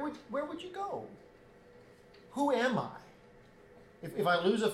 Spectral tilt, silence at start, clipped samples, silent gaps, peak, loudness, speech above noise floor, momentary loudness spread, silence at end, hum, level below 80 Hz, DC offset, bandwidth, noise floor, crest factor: -5 dB/octave; 0 s; under 0.1%; none; -16 dBFS; -34 LUFS; 25 dB; 17 LU; 0 s; none; -70 dBFS; under 0.1%; 15 kHz; -58 dBFS; 18 dB